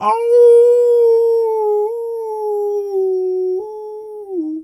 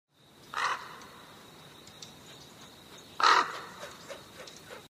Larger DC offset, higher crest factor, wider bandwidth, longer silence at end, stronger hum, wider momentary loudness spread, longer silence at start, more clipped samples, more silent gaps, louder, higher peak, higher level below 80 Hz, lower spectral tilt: neither; second, 12 dB vs 26 dB; second, 12 kHz vs 15.5 kHz; about the same, 0 s vs 0.1 s; neither; second, 17 LU vs 26 LU; second, 0 s vs 0.55 s; neither; neither; first, -14 LUFS vs -28 LUFS; first, -4 dBFS vs -8 dBFS; about the same, -70 dBFS vs -72 dBFS; first, -5.5 dB/octave vs -1 dB/octave